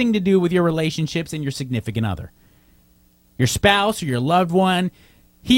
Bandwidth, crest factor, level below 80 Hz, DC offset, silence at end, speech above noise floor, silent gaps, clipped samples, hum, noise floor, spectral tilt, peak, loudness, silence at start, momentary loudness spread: 16.5 kHz; 20 dB; -44 dBFS; under 0.1%; 0 s; 37 dB; none; under 0.1%; none; -56 dBFS; -5.5 dB/octave; 0 dBFS; -20 LUFS; 0 s; 11 LU